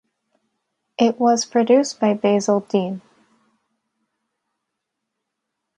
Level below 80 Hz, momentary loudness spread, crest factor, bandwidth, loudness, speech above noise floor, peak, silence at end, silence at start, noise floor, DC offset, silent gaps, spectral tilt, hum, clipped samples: -70 dBFS; 11 LU; 18 dB; 10.5 kHz; -19 LUFS; 62 dB; -4 dBFS; 2.8 s; 1 s; -80 dBFS; under 0.1%; none; -5 dB/octave; none; under 0.1%